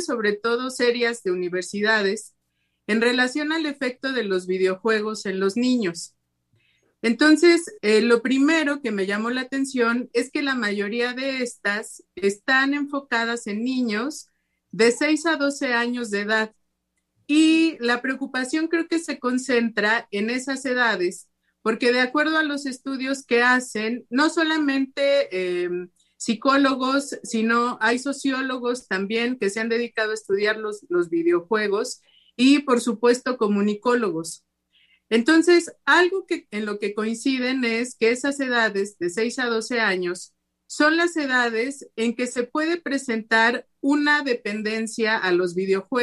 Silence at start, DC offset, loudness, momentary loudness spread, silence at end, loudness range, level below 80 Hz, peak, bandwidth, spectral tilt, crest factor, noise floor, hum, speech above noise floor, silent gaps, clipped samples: 0 s; under 0.1%; -22 LUFS; 9 LU; 0 s; 3 LU; -72 dBFS; -4 dBFS; 12.5 kHz; -3.5 dB/octave; 18 dB; -75 dBFS; none; 53 dB; none; under 0.1%